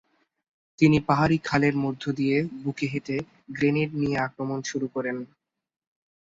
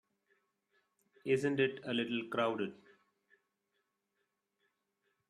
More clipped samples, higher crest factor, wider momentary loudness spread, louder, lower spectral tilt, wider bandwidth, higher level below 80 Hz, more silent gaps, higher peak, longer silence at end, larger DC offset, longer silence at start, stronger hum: neither; about the same, 20 dB vs 22 dB; about the same, 11 LU vs 9 LU; first, -25 LUFS vs -35 LUFS; about the same, -6.5 dB/octave vs -6 dB/octave; second, 7.8 kHz vs 11.5 kHz; first, -56 dBFS vs -82 dBFS; neither; first, -6 dBFS vs -18 dBFS; second, 0.95 s vs 2.55 s; neither; second, 0.8 s vs 1.25 s; neither